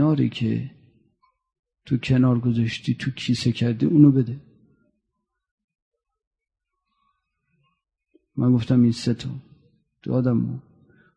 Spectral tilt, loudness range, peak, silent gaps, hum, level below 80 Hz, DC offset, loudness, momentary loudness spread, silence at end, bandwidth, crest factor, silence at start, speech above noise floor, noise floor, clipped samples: -7.5 dB/octave; 5 LU; -2 dBFS; 1.59-1.63 s, 5.51-5.58 s, 5.64-5.68 s, 5.82-5.92 s, 6.27-6.31 s; none; -56 dBFS; under 0.1%; -22 LUFS; 19 LU; 0.55 s; 10 kHz; 20 dB; 0 s; 59 dB; -79 dBFS; under 0.1%